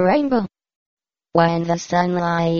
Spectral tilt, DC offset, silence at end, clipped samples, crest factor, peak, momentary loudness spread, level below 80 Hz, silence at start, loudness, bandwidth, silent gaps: -5.5 dB/octave; under 0.1%; 0 s; under 0.1%; 18 dB; -2 dBFS; 5 LU; -56 dBFS; 0 s; -19 LUFS; 7.2 kHz; 0.76-0.97 s